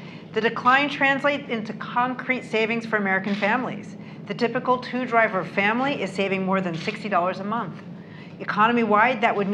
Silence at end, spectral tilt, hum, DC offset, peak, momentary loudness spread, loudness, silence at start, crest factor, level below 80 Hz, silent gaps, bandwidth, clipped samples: 0 s; -6 dB/octave; none; under 0.1%; -4 dBFS; 15 LU; -23 LUFS; 0 s; 20 dB; -70 dBFS; none; 10 kHz; under 0.1%